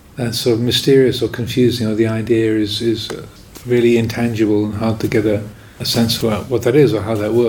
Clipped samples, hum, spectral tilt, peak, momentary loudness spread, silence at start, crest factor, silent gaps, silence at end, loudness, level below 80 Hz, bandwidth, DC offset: under 0.1%; none; -5.5 dB/octave; -2 dBFS; 10 LU; 0.15 s; 14 dB; none; 0 s; -16 LUFS; -44 dBFS; 19 kHz; under 0.1%